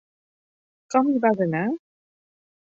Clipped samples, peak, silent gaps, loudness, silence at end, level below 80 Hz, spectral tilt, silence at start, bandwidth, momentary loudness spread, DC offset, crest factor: under 0.1%; -6 dBFS; none; -23 LUFS; 1 s; -72 dBFS; -7.5 dB/octave; 0.9 s; 7.8 kHz; 8 LU; under 0.1%; 20 dB